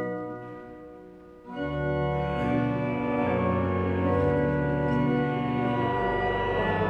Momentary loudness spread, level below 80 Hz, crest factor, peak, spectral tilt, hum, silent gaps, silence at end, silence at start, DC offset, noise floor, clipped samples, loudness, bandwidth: 16 LU; -44 dBFS; 14 dB; -12 dBFS; -9 dB/octave; none; none; 0 s; 0 s; under 0.1%; -47 dBFS; under 0.1%; -27 LUFS; 7.8 kHz